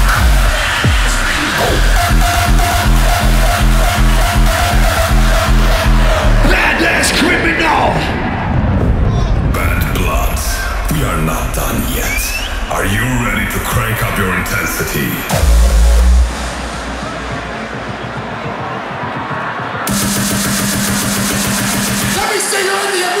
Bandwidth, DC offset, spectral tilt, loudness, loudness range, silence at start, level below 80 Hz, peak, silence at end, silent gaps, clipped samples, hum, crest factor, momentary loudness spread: 16.5 kHz; under 0.1%; -4 dB/octave; -14 LUFS; 5 LU; 0 s; -16 dBFS; 0 dBFS; 0 s; none; under 0.1%; none; 12 dB; 10 LU